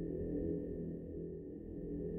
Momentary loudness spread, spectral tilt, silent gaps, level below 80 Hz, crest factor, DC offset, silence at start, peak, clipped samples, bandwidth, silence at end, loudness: 7 LU; -12.5 dB/octave; none; -54 dBFS; 14 dB; under 0.1%; 0 s; -28 dBFS; under 0.1%; 2.2 kHz; 0 s; -43 LUFS